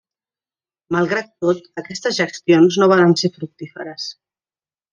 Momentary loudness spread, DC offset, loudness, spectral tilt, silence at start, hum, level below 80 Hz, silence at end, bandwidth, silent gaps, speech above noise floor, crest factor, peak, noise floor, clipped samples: 18 LU; under 0.1%; -17 LUFS; -5.5 dB/octave; 0.9 s; none; -64 dBFS; 0.8 s; 7.6 kHz; none; over 73 dB; 18 dB; -2 dBFS; under -90 dBFS; under 0.1%